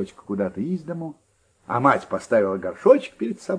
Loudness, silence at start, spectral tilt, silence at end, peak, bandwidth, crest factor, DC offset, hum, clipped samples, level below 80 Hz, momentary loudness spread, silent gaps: -22 LUFS; 0 s; -7 dB/octave; 0 s; -2 dBFS; 10.5 kHz; 20 dB; under 0.1%; none; under 0.1%; -64 dBFS; 13 LU; none